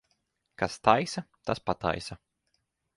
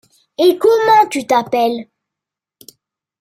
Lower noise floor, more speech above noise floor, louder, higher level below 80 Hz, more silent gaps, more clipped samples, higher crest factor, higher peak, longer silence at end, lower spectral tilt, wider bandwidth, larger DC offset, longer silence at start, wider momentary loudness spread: second, -77 dBFS vs -84 dBFS; second, 49 dB vs 72 dB; second, -29 LUFS vs -13 LUFS; first, -56 dBFS vs -64 dBFS; neither; neither; first, 26 dB vs 14 dB; second, -6 dBFS vs -2 dBFS; second, 0.8 s vs 1.4 s; about the same, -5 dB/octave vs -4 dB/octave; second, 11.5 kHz vs 16 kHz; neither; first, 0.6 s vs 0.4 s; about the same, 13 LU vs 11 LU